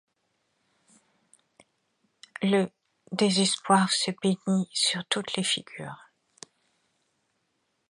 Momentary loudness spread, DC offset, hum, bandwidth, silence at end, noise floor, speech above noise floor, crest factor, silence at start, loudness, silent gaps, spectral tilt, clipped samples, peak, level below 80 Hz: 18 LU; under 0.1%; none; 11.5 kHz; 1.95 s; -76 dBFS; 50 dB; 22 dB; 2.4 s; -26 LUFS; none; -3.5 dB/octave; under 0.1%; -8 dBFS; -76 dBFS